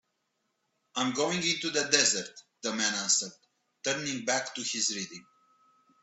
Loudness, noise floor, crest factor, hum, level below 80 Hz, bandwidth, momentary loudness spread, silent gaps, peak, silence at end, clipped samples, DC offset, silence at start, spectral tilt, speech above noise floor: -28 LUFS; -79 dBFS; 24 dB; none; -76 dBFS; 8.6 kHz; 14 LU; none; -8 dBFS; 0.8 s; under 0.1%; under 0.1%; 0.95 s; -1 dB/octave; 49 dB